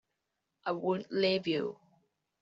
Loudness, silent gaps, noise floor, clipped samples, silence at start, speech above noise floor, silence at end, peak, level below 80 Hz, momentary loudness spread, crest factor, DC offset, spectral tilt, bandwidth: -33 LUFS; none; -85 dBFS; under 0.1%; 0.65 s; 53 dB; 0.65 s; -18 dBFS; -78 dBFS; 10 LU; 18 dB; under 0.1%; -3.5 dB/octave; 7.4 kHz